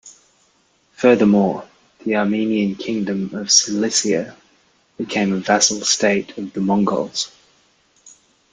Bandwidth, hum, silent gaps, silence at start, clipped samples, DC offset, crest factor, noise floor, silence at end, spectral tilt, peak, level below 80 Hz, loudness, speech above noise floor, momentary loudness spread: 9.6 kHz; none; none; 0.05 s; under 0.1%; under 0.1%; 20 dB; -60 dBFS; 0.45 s; -3.5 dB/octave; 0 dBFS; -60 dBFS; -18 LUFS; 42 dB; 11 LU